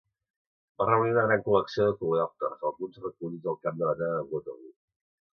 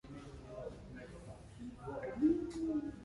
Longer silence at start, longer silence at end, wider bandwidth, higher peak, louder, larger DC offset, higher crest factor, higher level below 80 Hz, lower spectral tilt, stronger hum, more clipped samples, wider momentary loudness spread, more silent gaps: first, 0.8 s vs 0.05 s; first, 0.7 s vs 0 s; second, 6.6 kHz vs 11.5 kHz; first, -10 dBFS vs -22 dBFS; first, -28 LUFS vs -39 LUFS; neither; about the same, 20 dB vs 18 dB; second, -66 dBFS vs -58 dBFS; about the same, -8 dB/octave vs -7.5 dB/octave; neither; neither; second, 13 LU vs 18 LU; neither